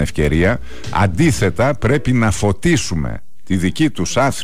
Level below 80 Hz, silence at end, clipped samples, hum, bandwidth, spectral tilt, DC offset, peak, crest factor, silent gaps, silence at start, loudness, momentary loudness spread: -30 dBFS; 0 s; under 0.1%; none; 16 kHz; -5.5 dB/octave; 6%; -6 dBFS; 12 dB; none; 0 s; -17 LUFS; 8 LU